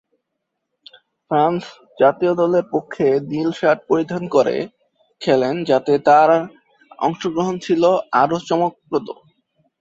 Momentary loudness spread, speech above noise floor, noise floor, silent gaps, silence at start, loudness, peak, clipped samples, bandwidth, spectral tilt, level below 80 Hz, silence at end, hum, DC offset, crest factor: 10 LU; 60 dB; -77 dBFS; none; 1.3 s; -18 LUFS; -2 dBFS; under 0.1%; 7.8 kHz; -6.5 dB/octave; -62 dBFS; 0.65 s; none; under 0.1%; 18 dB